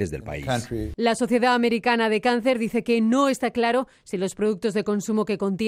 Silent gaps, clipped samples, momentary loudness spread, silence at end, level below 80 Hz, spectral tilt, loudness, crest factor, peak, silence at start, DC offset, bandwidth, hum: none; under 0.1%; 8 LU; 0 s; -48 dBFS; -5 dB/octave; -23 LUFS; 14 dB; -8 dBFS; 0 s; under 0.1%; 15 kHz; none